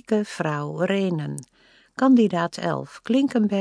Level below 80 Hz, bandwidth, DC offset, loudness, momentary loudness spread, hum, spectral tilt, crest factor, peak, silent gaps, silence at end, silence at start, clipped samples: -68 dBFS; 10.5 kHz; under 0.1%; -23 LUFS; 13 LU; none; -6.5 dB/octave; 16 dB; -8 dBFS; none; 0 s; 0.1 s; under 0.1%